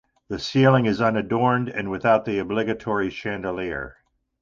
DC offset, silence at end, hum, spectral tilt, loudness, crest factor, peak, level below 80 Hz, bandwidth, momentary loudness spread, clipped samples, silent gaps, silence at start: under 0.1%; 0.5 s; none; -7 dB/octave; -23 LUFS; 18 dB; -4 dBFS; -52 dBFS; 7.4 kHz; 12 LU; under 0.1%; none; 0.3 s